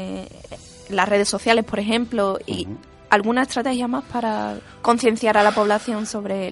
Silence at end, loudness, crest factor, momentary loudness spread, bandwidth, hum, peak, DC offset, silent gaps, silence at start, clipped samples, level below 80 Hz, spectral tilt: 0 s; -20 LUFS; 22 dB; 16 LU; 11.5 kHz; none; 0 dBFS; under 0.1%; none; 0 s; under 0.1%; -52 dBFS; -4 dB/octave